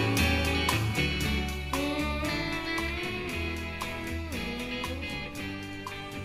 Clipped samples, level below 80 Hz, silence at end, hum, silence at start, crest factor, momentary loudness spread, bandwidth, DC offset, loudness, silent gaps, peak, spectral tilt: under 0.1%; -40 dBFS; 0 s; none; 0 s; 20 dB; 10 LU; 15.5 kHz; under 0.1%; -31 LUFS; none; -12 dBFS; -4.5 dB/octave